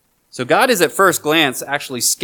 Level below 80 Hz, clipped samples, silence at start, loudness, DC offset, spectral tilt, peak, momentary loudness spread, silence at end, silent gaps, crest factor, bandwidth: -66 dBFS; under 0.1%; 0.35 s; -15 LUFS; under 0.1%; -2 dB/octave; 0 dBFS; 9 LU; 0 s; none; 16 dB; 19.5 kHz